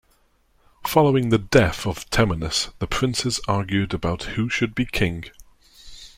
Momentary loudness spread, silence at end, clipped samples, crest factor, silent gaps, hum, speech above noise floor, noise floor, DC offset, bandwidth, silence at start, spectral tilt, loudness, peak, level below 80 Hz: 9 LU; 0.1 s; under 0.1%; 20 dB; none; none; 40 dB; -61 dBFS; under 0.1%; 16.5 kHz; 0.8 s; -5 dB/octave; -22 LUFS; -2 dBFS; -40 dBFS